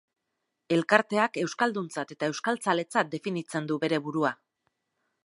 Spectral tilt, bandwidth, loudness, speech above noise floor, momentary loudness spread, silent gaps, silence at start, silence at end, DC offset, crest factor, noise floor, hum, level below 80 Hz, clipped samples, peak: -5 dB/octave; 11.5 kHz; -28 LUFS; 54 dB; 9 LU; none; 0.7 s; 0.9 s; under 0.1%; 26 dB; -82 dBFS; none; -80 dBFS; under 0.1%; -4 dBFS